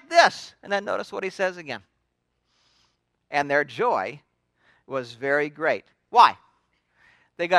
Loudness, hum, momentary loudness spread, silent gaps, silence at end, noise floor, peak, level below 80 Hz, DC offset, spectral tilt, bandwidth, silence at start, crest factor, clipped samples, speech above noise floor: -24 LUFS; 60 Hz at -70 dBFS; 17 LU; none; 0 s; -75 dBFS; -2 dBFS; -74 dBFS; under 0.1%; -3.5 dB/octave; 12 kHz; 0.1 s; 24 dB; under 0.1%; 52 dB